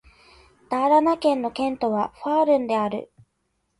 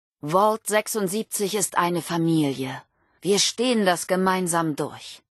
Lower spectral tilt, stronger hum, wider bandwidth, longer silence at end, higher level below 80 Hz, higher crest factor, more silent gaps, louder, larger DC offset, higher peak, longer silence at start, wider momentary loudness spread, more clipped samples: first, -6 dB/octave vs -4 dB/octave; neither; about the same, 11.5 kHz vs 12.5 kHz; first, 0.75 s vs 0.15 s; first, -60 dBFS vs -70 dBFS; about the same, 16 dB vs 18 dB; neither; about the same, -22 LUFS vs -23 LUFS; neither; about the same, -6 dBFS vs -6 dBFS; first, 0.7 s vs 0.25 s; about the same, 9 LU vs 11 LU; neither